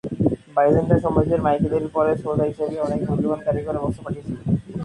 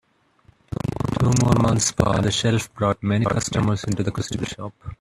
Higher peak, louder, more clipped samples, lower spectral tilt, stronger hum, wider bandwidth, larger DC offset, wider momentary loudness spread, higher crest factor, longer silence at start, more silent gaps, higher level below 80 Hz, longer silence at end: about the same, -4 dBFS vs -2 dBFS; about the same, -22 LUFS vs -21 LUFS; neither; first, -9.5 dB/octave vs -5 dB/octave; neither; second, 11 kHz vs 13.5 kHz; neither; second, 8 LU vs 11 LU; about the same, 16 dB vs 20 dB; second, 0.05 s vs 0.7 s; neither; about the same, -42 dBFS vs -42 dBFS; about the same, 0 s vs 0.05 s